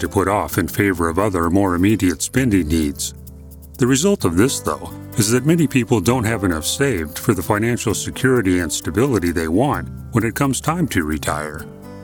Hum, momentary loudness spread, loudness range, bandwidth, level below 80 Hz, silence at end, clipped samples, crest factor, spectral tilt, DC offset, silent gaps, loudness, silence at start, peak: none; 9 LU; 1 LU; 19 kHz; -38 dBFS; 0 s; under 0.1%; 18 dB; -5 dB/octave; under 0.1%; none; -18 LUFS; 0 s; 0 dBFS